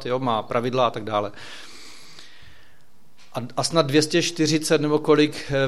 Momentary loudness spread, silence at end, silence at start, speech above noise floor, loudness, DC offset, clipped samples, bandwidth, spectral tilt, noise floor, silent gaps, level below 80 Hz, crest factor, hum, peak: 20 LU; 0 s; 0 s; 37 dB; -22 LUFS; 1%; under 0.1%; 14.5 kHz; -4.5 dB/octave; -59 dBFS; none; -56 dBFS; 20 dB; none; -4 dBFS